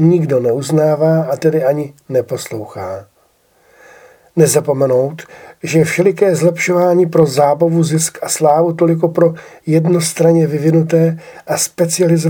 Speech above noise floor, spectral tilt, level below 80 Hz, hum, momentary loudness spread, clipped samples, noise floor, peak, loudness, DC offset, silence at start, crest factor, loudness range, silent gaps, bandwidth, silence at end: 42 dB; -6 dB/octave; -60 dBFS; none; 11 LU; under 0.1%; -55 dBFS; 0 dBFS; -13 LUFS; under 0.1%; 0 s; 14 dB; 6 LU; none; 18.5 kHz; 0 s